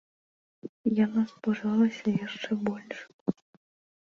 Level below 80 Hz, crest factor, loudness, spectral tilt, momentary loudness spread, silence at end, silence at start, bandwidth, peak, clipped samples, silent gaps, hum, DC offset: -70 dBFS; 18 dB; -29 LUFS; -7 dB/octave; 16 LU; 0.8 s; 0.65 s; 7 kHz; -12 dBFS; under 0.1%; 0.69-0.84 s, 3.14-3.26 s; none; under 0.1%